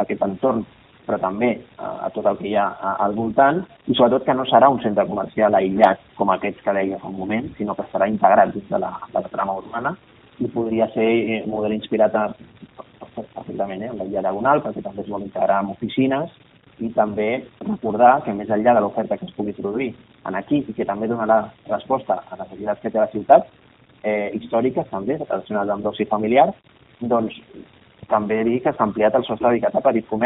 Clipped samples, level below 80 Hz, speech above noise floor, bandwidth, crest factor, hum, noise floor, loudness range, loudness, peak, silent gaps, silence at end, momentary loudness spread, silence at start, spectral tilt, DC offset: under 0.1%; -56 dBFS; 23 dB; 4 kHz; 20 dB; none; -43 dBFS; 5 LU; -21 LUFS; 0 dBFS; none; 0 s; 13 LU; 0 s; -4.5 dB/octave; under 0.1%